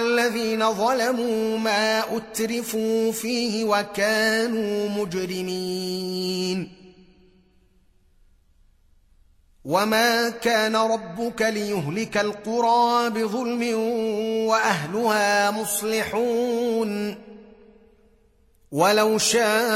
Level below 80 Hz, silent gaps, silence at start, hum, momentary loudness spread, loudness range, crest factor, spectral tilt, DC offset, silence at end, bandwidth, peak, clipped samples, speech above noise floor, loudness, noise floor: -60 dBFS; none; 0 s; none; 8 LU; 7 LU; 18 dB; -3.5 dB/octave; under 0.1%; 0 s; 16 kHz; -4 dBFS; under 0.1%; 36 dB; -23 LUFS; -59 dBFS